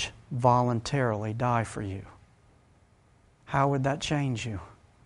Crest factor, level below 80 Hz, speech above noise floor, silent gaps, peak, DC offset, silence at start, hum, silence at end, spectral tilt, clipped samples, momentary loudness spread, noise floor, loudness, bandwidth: 22 dB; -54 dBFS; 34 dB; none; -8 dBFS; under 0.1%; 0 s; none; 0.35 s; -6 dB/octave; under 0.1%; 13 LU; -61 dBFS; -28 LUFS; 11.5 kHz